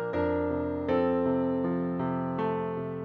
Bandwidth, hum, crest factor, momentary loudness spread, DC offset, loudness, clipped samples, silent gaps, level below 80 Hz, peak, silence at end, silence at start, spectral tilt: 4.8 kHz; none; 14 dB; 4 LU; under 0.1%; -29 LUFS; under 0.1%; none; -54 dBFS; -16 dBFS; 0 s; 0 s; -10 dB/octave